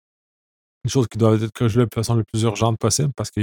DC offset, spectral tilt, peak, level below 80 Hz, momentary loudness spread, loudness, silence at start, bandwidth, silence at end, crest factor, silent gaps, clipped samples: under 0.1%; -5.5 dB/octave; -2 dBFS; -48 dBFS; 4 LU; -20 LUFS; 0.85 s; 17.5 kHz; 0 s; 18 dB; none; under 0.1%